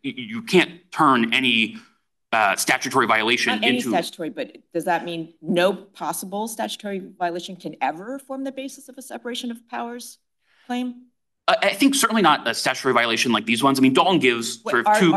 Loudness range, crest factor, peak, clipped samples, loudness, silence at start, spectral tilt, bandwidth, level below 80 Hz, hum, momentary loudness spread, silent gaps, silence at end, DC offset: 12 LU; 20 dB; -2 dBFS; under 0.1%; -21 LUFS; 0.05 s; -3.5 dB/octave; 12.5 kHz; -70 dBFS; none; 15 LU; none; 0 s; under 0.1%